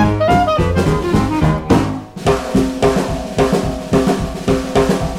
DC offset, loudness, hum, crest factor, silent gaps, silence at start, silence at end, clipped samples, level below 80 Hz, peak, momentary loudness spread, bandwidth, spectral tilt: under 0.1%; -16 LUFS; none; 12 dB; none; 0 s; 0 s; under 0.1%; -28 dBFS; -2 dBFS; 5 LU; 16 kHz; -6.5 dB/octave